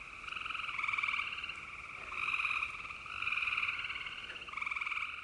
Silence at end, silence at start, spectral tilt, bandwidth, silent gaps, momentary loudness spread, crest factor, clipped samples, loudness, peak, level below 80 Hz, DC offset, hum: 0 s; 0 s; -1 dB/octave; 11.5 kHz; none; 10 LU; 18 dB; under 0.1%; -36 LUFS; -22 dBFS; -66 dBFS; under 0.1%; none